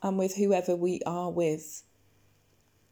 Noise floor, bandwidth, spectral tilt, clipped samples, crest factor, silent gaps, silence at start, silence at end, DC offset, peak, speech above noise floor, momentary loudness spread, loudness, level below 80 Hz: -67 dBFS; 19 kHz; -6 dB/octave; under 0.1%; 18 dB; none; 0 s; 1.1 s; under 0.1%; -14 dBFS; 38 dB; 12 LU; -29 LUFS; -72 dBFS